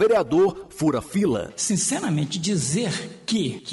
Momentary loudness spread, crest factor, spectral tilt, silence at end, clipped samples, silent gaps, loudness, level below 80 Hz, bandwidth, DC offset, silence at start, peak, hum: 5 LU; 12 dB; -4.5 dB/octave; 0 s; under 0.1%; none; -23 LUFS; -54 dBFS; 11.5 kHz; under 0.1%; 0 s; -12 dBFS; none